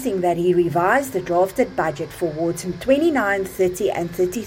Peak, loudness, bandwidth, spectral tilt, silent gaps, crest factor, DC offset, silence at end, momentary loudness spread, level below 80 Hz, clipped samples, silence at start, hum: -4 dBFS; -20 LUFS; 17 kHz; -5.5 dB/octave; none; 16 dB; under 0.1%; 0 s; 7 LU; -50 dBFS; under 0.1%; 0 s; none